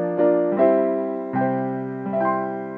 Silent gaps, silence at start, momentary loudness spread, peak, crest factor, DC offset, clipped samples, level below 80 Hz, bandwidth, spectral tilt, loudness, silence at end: none; 0 s; 8 LU; -6 dBFS; 16 dB; under 0.1%; under 0.1%; -70 dBFS; 4.3 kHz; -11 dB/octave; -22 LUFS; 0 s